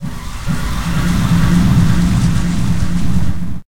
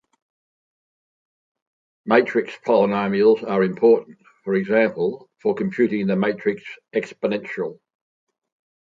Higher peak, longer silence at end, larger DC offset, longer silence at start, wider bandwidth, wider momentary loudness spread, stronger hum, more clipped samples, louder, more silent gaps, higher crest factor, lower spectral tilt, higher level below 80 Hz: about the same, 0 dBFS vs 0 dBFS; second, 0.1 s vs 1.1 s; neither; second, 0 s vs 2.05 s; first, 17 kHz vs 7.4 kHz; about the same, 10 LU vs 10 LU; neither; neither; first, -15 LUFS vs -21 LUFS; neither; second, 14 dB vs 22 dB; second, -6.5 dB/octave vs -8 dB/octave; first, -22 dBFS vs -68 dBFS